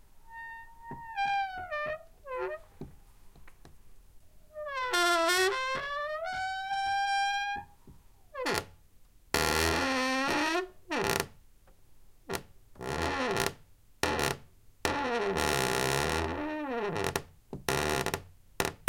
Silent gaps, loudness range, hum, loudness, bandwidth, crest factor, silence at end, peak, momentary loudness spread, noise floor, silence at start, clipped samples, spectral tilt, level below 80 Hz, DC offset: none; 7 LU; none; -31 LUFS; 17 kHz; 26 dB; 0.05 s; -8 dBFS; 17 LU; -57 dBFS; 0.15 s; under 0.1%; -3 dB/octave; -52 dBFS; under 0.1%